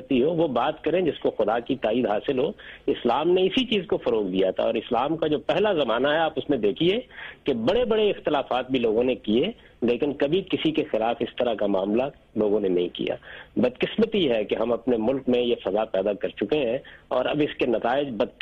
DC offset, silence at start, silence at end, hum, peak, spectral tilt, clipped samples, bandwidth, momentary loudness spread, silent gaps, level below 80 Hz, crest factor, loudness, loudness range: under 0.1%; 0 s; 0.1 s; none; -10 dBFS; -7.5 dB/octave; under 0.1%; 7 kHz; 6 LU; none; -54 dBFS; 14 dB; -24 LUFS; 1 LU